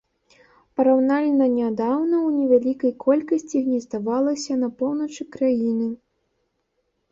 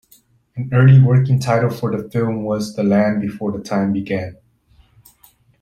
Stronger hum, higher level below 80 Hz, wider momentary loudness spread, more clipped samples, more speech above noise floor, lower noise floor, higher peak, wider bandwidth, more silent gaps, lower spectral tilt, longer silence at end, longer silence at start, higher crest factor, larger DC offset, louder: neither; second, -66 dBFS vs -52 dBFS; second, 7 LU vs 14 LU; neither; first, 52 dB vs 38 dB; first, -73 dBFS vs -54 dBFS; second, -6 dBFS vs -2 dBFS; second, 7.8 kHz vs 10 kHz; neither; second, -6 dB/octave vs -8.5 dB/octave; second, 1.15 s vs 1.3 s; first, 0.8 s vs 0.55 s; about the same, 16 dB vs 16 dB; neither; second, -22 LUFS vs -17 LUFS